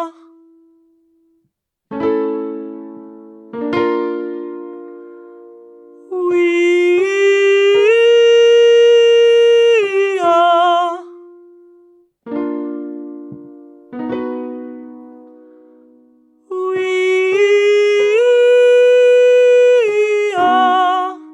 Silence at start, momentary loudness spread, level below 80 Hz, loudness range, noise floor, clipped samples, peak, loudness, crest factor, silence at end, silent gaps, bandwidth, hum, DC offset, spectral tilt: 0 s; 21 LU; -68 dBFS; 16 LU; -69 dBFS; under 0.1%; -2 dBFS; -12 LUFS; 12 dB; 0.05 s; none; 8.4 kHz; none; under 0.1%; -3.5 dB/octave